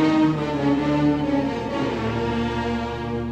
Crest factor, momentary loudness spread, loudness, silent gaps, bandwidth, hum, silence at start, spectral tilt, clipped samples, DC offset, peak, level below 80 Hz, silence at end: 14 dB; 6 LU; -23 LUFS; none; 8.4 kHz; none; 0 s; -7.5 dB/octave; under 0.1%; under 0.1%; -8 dBFS; -40 dBFS; 0 s